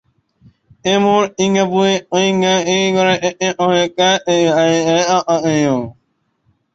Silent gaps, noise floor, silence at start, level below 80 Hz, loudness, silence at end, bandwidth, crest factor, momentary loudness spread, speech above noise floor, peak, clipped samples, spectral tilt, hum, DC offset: none; -64 dBFS; 0.85 s; -56 dBFS; -14 LUFS; 0.85 s; 8 kHz; 14 dB; 4 LU; 49 dB; -2 dBFS; under 0.1%; -4 dB/octave; none; under 0.1%